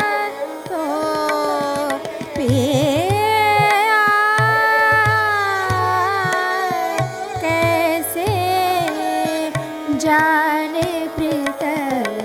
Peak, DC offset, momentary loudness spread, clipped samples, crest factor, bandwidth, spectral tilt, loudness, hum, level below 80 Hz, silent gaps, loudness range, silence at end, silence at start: -6 dBFS; under 0.1%; 9 LU; under 0.1%; 12 dB; 17.5 kHz; -4.5 dB/octave; -17 LUFS; none; -48 dBFS; none; 4 LU; 0 s; 0 s